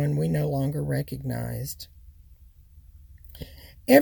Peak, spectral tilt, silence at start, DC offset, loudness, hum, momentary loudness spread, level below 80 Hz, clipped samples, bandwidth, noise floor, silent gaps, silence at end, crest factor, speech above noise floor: -4 dBFS; -6.5 dB/octave; 0 s; under 0.1%; -27 LUFS; none; 18 LU; -48 dBFS; under 0.1%; 19 kHz; -52 dBFS; none; 0 s; 24 dB; 24 dB